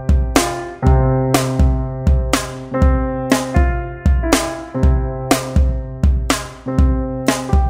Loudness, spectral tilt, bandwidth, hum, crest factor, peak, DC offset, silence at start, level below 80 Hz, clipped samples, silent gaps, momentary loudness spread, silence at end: -17 LUFS; -5.5 dB/octave; 16 kHz; none; 16 dB; 0 dBFS; under 0.1%; 0 s; -18 dBFS; under 0.1%; none; 5 LU; 0 s